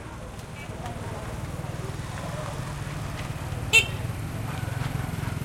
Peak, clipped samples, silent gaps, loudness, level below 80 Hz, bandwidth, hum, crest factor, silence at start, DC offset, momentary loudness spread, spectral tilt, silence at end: -4 dBFS; under 0.1%; none; -29 LUFS; -42 dBFS; 16.5 kHz; none; 26 dB; 0 s; under 0.1%; 17 LU; -4 dB/octave; 0 s